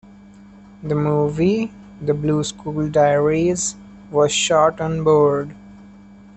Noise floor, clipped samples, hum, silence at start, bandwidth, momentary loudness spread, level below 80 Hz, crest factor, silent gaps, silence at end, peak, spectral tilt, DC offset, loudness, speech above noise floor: -44 dBFS; under 0.1%; none; 0.8 s; 8.8 kHz; 10 LU; -50 dBFS; 16 dB; none; 0.55 s; -4 dBFS; -5 dB/octave; under 0.1%; -19 LUFS; 26 dB